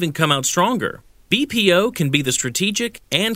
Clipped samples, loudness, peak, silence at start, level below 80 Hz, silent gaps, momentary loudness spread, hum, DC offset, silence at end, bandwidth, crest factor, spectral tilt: under 0.1%; -18 LUFS; 0 dBFS; 0 s; -52 dBFS; none; 6 LU; none; under 0.1%; 0 s; 16 kHz; 20 dB; -3.5 dB/octave